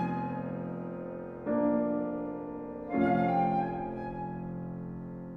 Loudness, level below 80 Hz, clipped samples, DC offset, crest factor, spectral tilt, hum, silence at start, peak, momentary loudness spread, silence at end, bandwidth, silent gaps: -33 LUFS; -58 dBFS; under 0.1%; under 0.1%; 16 dB; -10.5 dB/octave; none; 0 s; -16 dBFS; 12 LU; 0 s; 5 kHz; none